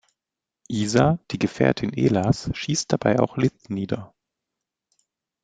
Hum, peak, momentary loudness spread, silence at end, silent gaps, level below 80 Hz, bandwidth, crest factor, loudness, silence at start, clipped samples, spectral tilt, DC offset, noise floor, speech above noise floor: none; -2 dBFS; 9 LU; 1.35 s; none; -50 dBFS; 9.4 kHz; 22 dB; -23 LUFS; 0.7 s; under 0.1%; -6 dB/octave; under 0.1%; -87 dBFS; 65 dB